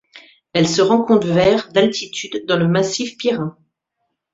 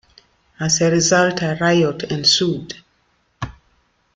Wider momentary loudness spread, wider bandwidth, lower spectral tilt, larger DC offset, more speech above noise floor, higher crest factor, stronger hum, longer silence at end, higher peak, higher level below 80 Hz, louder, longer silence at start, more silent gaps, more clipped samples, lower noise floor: second, 10 LU vs 18 LU; second, 8 kHz vs 9.4 kHz; first, -5 dB/octave vs -3.5 dB/octave; neither; first, 58 dB vs 46 dB; about the same, 16 dB vs 18 dB; neither; first, 0.8 s vs 0.65 s; about the same, -2 dBFS vs -2 dBFS; about the same, -52 dBFS vs -50 dBFS; about the same, -17 LUFS vs -16 LUFS; second, 0.15 s vs 0.6 s; neither; neither; first, -74 dBFS vs -63 dBFS